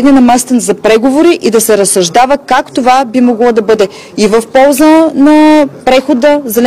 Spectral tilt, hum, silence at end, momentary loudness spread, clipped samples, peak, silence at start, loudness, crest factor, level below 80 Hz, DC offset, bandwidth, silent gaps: -4 dB/octave; none; 0 s; 5 LU; 1%; 0 dBFS; 0 s; -7 LUFS; 6 dB; -40 dBFS; under 0.1%; 15.5 kHz; none